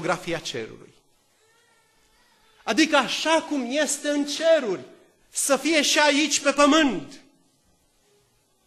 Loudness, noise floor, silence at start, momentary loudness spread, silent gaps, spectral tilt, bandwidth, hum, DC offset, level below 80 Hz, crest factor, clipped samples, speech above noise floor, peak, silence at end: -22 LUFS; -65 dBFS; 0 s; 14 LU; none; -2 dB/octave; 13 kHz; none; under 0.1%; -60 dBFS; 18 dB; under 0.1%; 42 dB; -6 dBFS; 1.5 s